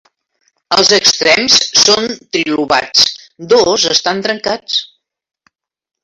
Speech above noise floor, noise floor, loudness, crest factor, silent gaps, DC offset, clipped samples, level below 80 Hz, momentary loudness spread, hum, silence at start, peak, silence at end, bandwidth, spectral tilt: 50 dB; -62 dBFS; -10 LUFS; 14 dB; none; under 0.1%; under 0.1%; -52 dBFS; 10 LU; none; 0.7 s; 0 dBFS; 1.2 s; 16 kHz; -1 dB/octave